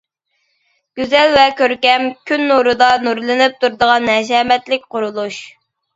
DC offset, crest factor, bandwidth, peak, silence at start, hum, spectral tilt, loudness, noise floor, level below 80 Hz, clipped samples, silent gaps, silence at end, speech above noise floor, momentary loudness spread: under 0.1%; 14 dB; 7.8 kHz; 0 dBFS; 0.95 s; none; -3 dB/octave; -14 LUFS; -67 dBFS; -54 dBFS; under 0.1%; none; 0.45 s; 53 dB; 11 LU